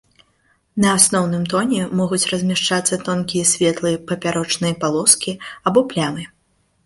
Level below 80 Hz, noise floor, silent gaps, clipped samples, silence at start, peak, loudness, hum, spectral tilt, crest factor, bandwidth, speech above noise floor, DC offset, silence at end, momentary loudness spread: -54 dBFS; -63 dBFS; none; under 0.1%; 0.75 s; 0 dBFS; -17 LUFS; none; -3.5 dB/octave; 20 dB; 13 kHz; 45 dB; under 0.1%; 0.6 s; 9 LU